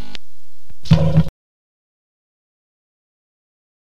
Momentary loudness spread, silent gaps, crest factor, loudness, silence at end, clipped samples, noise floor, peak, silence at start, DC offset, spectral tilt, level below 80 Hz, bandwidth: 24 LU; none; 22 dB; -17 LUFS; 2.6 s; under 0.1%; -58 dBFS; 0 dBFS; 0.85 s; 20%; -8 dB/octave; -36 dBFS; 7.2 kHz